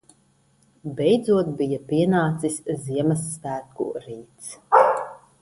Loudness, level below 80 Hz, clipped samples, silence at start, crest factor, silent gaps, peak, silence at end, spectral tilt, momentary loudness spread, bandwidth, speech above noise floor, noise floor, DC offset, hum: -22 LUFS; -60 dBFS; under 0.1%; 0.85 s; 22 dB; none; -2 dBFS; 0.25 s; -6 dB/octave; 19 LU; 11.5 kHz; 39 dB; -62 dBFS; under 0.1%; none